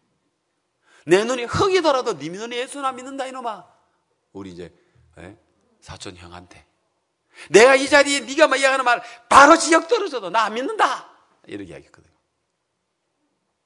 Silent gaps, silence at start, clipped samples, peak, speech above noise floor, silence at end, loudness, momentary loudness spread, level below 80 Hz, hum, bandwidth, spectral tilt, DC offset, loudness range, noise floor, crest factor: none; 1.05 s; under 0.1%; 0 dBFS; 56 dB; 1.85 s; -17 LUFS; 25 LU; -58 dBFS; none; 12 kHz; -3 dB/octave; under 0.1%; 17 LU; -74 dBFS; 20 dB